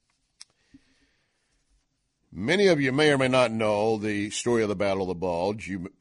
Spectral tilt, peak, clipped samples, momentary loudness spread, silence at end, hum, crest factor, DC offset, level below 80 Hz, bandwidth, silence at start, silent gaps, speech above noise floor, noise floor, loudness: -5 dB/octave; -8 dBFS; under 0.1%; 10 LU; 0.1 s; none; 18 dB; under 0.1%; -60 dBFS; 11 kHz; 2.3 s; none; 49 dB; -74 dBFS; -24 LUFS